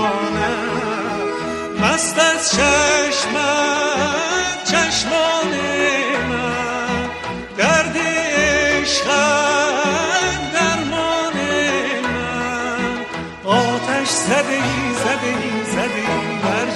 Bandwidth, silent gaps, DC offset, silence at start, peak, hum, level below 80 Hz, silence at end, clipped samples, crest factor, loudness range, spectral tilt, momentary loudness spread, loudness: 13 kHz; none; under 0.1%; 0 s; -2 dBFS; none; -42 dBFS; 0 s; under 0.1%; 16 dB; 3 LU; -3 dB/octave; 7 LU; -17 LUFS